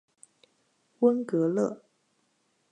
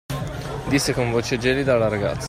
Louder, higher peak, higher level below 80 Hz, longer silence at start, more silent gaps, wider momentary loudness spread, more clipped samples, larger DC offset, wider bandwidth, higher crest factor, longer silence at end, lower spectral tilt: second, -27 LUFS vs -22 LUFS; second, -10 dBFS vs -6 dBFS; second, -84 dBFS vs -40 dBFS; first, 1 s vs 0.1 s; neither; second, 7 LU vs 10 LU; neither; neither; second, 10 kHz vs 16 kHz; about the same, 20 dB vs 16 dB; first, 0.95 s vs 0 s; first, -8.5 dB/octave vs -5 dB/octave